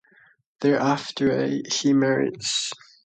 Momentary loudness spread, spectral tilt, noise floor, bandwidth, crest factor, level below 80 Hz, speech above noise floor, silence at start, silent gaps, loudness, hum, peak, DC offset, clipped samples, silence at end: 5 LU; -4 dB/octave; -58 dBFS; 9.4 kHz; 16 dB; -64 dBFS; 35 dB; 0.6 s; none; -23 LUFS; none; -8 dBFS; under 0.1%; under 0.1%; 0.3 s